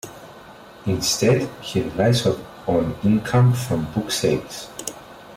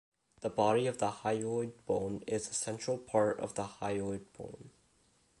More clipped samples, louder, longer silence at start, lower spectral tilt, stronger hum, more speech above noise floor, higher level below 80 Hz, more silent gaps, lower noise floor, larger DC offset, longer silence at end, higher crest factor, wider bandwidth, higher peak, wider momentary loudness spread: neither; first, -21 LUFS vs -35 LUFS; second, 0.05 s vs 0.4 s; about the same, -5.5 dB/octave vs -5 dB/octave; neither; second, 23 dB vs 36 dB; first, -48 dBFS vs -66 dBFS; neither; second, -43 dBFS vs -70 dBFS; neither; second, 0 s vs 0.7 s; second, 14 dB vs 20 dB; first, 16 kHz vs 11.5 kHz; first, -8 dBFS vs -14 dBFS; about the same, 15 LU vs 13 LU